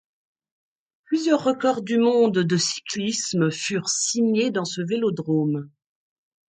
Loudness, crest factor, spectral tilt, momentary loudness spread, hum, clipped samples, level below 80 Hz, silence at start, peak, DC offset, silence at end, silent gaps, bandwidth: -22 LUFS; 18 dB; -4.5 dB/octave; 7 LU; none; under 0.1%; -70 dBFS; 1.1 s; -6 dBFS; under 0.1%; 0.8 s; none; 9.6 kHz